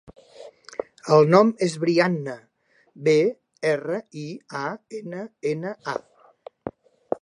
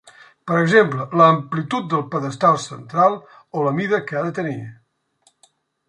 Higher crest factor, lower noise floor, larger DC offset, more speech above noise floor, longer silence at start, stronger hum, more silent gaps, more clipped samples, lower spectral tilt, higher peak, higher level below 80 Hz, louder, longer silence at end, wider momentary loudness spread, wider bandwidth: about the same, 22 dB vs 18 dB; second, -58 dBFS vs -62 dBFS; neither; second, 36 dB vs 43 dB; first, 0.4 s vs 0.05 s; neither; neither; neither; about the same, -6.5 dB/octave vs -6.5 dB/octave; about the same, -2 dBFS vs -2 dBFS; about the same, -68 dBFS vs -64 dBFS; second, -23 LUFS vs -19 LUFS; second, 0.05 s vs 1.15 s; first, 19 LU vs 15 LU; about the same, 10.5 kHz vs 11 kHz